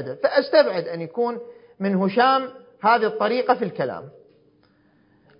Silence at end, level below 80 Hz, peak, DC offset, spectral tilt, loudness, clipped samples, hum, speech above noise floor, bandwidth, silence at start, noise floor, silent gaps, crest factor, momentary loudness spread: 1.3 s; -72 dBFS; -4 dBFS; under 0.1%; -10 dB/octave; -21 LUFS; under 0.1%; none; 38 dB; 5.4 kHz; 0 s; -59 dBFS; none; 20 dB; 11 LU